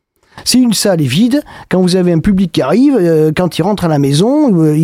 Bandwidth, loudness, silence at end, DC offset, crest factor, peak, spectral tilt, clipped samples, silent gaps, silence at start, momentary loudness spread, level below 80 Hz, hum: 16 kHz; -11 LUFS; 0 s; under 0.1%; 10 dB; 0 dBFS; -6 dB/octave; under 0.1%; none; 0.35 s; 4 LU; -38 dBFS; none